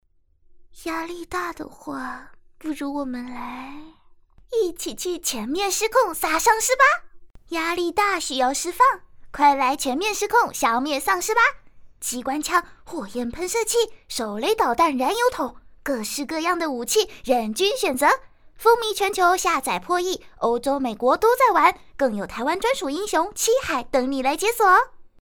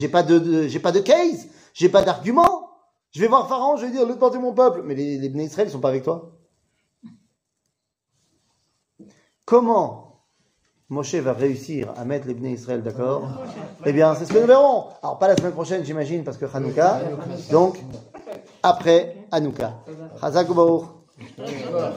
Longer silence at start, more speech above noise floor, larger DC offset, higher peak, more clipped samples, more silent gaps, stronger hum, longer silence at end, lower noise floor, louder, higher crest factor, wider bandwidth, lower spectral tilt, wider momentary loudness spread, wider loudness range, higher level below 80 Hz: first, 0.55 s vs 0 s; second, 34 dB vs 58 dB; neither; about the same, -4 dBFS vs -2 dBFS; neither; neither; neither; first, 0.15 s vs 0 s; second, -56 dBFS vs -77 dBFS; about the same, -22 LUFS vs -20 LUFS; about the same, 20 dB vs 20 dB; first, over 20 kHz vs 10.5 kHz; second, -2 dB/octave vs -6 dB/octave; about the same, 13 LU vs 15 LU; about the same, 9 LU vs 8 LU; first, -50 dBFS vs -60 dBFS